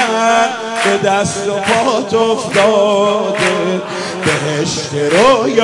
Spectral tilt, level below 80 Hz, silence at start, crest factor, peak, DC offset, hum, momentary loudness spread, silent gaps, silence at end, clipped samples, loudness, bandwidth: -4 dB/octave; -52 dBFS; 0 s; 14 dB; 0 dBFS; under 0.1%; none; 6 LU; none; 0 s; under 0.1%; -13 LUFS; 11.5 kHz